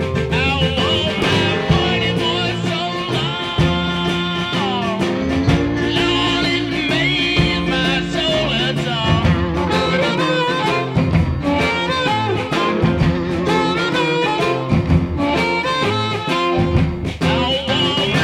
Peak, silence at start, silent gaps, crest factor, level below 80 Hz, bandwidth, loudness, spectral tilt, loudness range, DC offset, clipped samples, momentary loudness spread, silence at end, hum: -2 dBFS; 0 s; none; 16 dB; -32 dBFS; 12.5 kHz; -17 LUFS; -5.5 dB/octave; 1 LU; under 0.1%; under 0.1%; 3 LU; 0 s; none